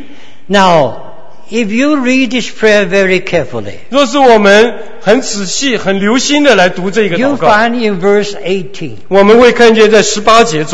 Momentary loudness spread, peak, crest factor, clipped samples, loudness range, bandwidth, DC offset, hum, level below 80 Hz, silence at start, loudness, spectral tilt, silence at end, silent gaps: 11 LU; 0 dBFS; 10 dB; 2%; 3 LU; 11 kHz; 8%; none; -42 dBFS; 0 s; -9 LUFS; -4 dB/octave; 0 s; none